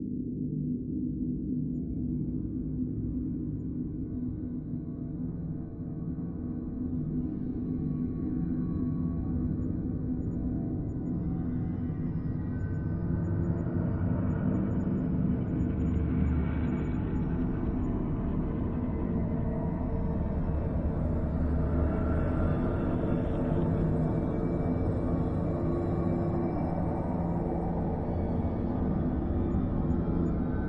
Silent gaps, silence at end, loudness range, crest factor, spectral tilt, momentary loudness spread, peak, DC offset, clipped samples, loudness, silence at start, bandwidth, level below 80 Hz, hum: none; 0 s; 5 LU; 14 dB; -11.5 dB/octave; 6 LU; -16 dBFS; under 0.1%; under 0.1%; -31 LUFS; 0 s; 4.1 kHz; -38 dBFS; none